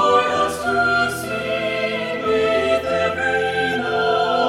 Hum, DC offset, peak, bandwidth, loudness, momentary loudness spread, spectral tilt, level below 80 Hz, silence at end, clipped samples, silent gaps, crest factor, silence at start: none; under 0.1%; -4 dBFS; 16.5 kHz; -19 LUFS; 5 LU; -4 dB/octave; -50 dBFS; 0 s; under 0.1%; none; 14 dB; 0 s